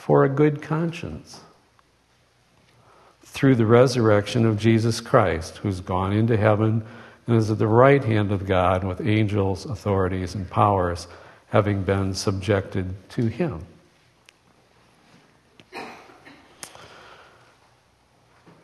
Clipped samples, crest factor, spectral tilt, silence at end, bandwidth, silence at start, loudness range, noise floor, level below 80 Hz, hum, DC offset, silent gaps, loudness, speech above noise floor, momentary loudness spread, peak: under 0.1%; 22 dB; -7 dB/octave; 1.8 s; 12.5 kHz; 0 s; 9 LU; -62 dBFS; -52 dBFS; none; under 0.1%; none; -21 LUFS; 41 dB; 21 LU; -2 dBFS